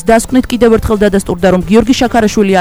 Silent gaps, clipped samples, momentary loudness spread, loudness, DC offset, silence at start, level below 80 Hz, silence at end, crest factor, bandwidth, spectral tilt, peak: none; 0.4%; 3 LU; -10 LUFS; 1%; 0.05 s; -26 dBFS; 0 s; 10 dB; over 20 kHz; -5.5 dB/octave; 0 dBFS